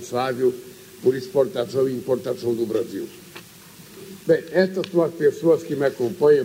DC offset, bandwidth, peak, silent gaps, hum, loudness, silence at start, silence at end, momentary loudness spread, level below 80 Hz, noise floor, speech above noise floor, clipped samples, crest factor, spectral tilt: under 0.1%; 16 kHz; -6 dBFS; none; none; -22 LUFS; 0 s; 0 s; 21 LU; -66 dBFS; -45 dBFS; 24 dB; under 0.1%; 16 dB; -6 dB/octave